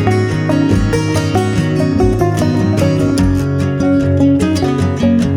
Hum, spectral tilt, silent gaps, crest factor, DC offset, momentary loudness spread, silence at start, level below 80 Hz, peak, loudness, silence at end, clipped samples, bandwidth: none; -7 dB/octave; none; 12 dB; under 0.1%; 3 LU; 0 s; -28 dBFS; 0 dBFS; -13 LUFS; 0 s; under 0.1%; 15 kHz